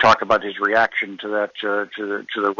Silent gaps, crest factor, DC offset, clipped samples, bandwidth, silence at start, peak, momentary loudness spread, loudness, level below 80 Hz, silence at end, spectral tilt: none; 16 dB; under 0.1%; under 0.1%; 7.4 kHz; 0 s; -4 dBFS; 8 LU; -20 LUFS; -56 dBFS; 0.05 s; -4 dB/octave